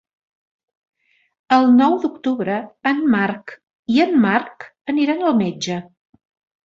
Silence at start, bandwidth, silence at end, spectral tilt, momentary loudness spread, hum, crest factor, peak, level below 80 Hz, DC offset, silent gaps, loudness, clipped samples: 1.5 s; 7.6 kHz; 0.85 s; -6 dB/octave; 17 LU; none; 18 dB; -2 dBFS; -64 dBFS; under 0.1%; 3.75-3.83 s, 4.81-4.85 s; -18 LUFS; under 0.1%